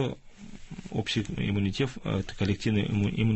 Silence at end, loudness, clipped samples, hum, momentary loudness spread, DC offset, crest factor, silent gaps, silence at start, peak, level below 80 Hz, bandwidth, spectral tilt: 0 s; -29 LUFS; under 0.1%; none; 18 LU; under 0.1%; 14 dB; none; 0 s; -14 dBFS; -46 dBFS; 8.4 kHz; -6.5 dB/octave